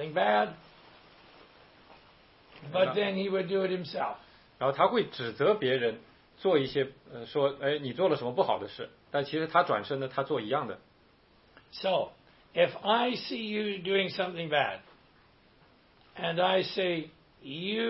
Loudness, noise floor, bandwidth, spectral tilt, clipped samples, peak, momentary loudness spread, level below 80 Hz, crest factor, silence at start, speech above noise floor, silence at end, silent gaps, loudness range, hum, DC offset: -30 LUFS; -63 dBFS; 5.8 kHz; -8.5 dB/octave; under 0.1%; -10 dBFS; 14 LU; -70 dBFS; 22 dB; 0 s; 33 dB; 0 s; none; 3 LU; none; under 0.1%